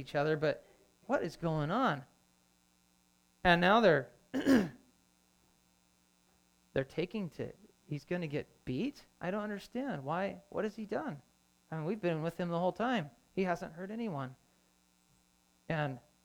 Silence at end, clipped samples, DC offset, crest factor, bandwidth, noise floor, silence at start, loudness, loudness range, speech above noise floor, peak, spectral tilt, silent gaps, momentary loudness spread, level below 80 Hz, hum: 0.25 s; under 0.1%; under 0.1%; 22 dB; 19 kHz; -71 dBFS; 0 s; -35 LUFS; 9 LU; 37 dB; -14 dBFS; -6.5 dB/octave; none; 14 LU; -64 dBFS; none